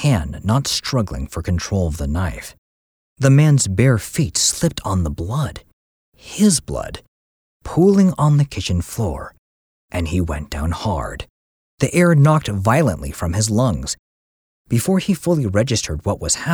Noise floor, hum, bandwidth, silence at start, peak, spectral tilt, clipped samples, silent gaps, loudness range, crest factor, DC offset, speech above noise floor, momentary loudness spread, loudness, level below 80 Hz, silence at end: under -90 dBFS; none; 19 kHz; 0 s; -2 dBFS; -5.5 dB/octave; under 0.1%; 2.58-3.16 s, 5.73-6.12 s, 7.08-7.60 s, 9.38-9.88 s, 11.30-11.78 s, 13.99-14.65 s; 4 LU; 16 dB; under 0.1%; over 73 dB; 13 LU; -18 LUFS; -34 dBFS; 0 s